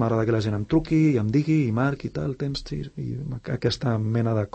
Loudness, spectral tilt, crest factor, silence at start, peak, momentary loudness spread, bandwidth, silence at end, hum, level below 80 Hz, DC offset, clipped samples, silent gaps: -25 LUFS; -7.5 dB/octave; 14 dB; 0 s; -10 dBFS; 11 LU; 8.6 kHz; 0.1 s; none; -46 dBFS; under 0.1%; under 0.1%; none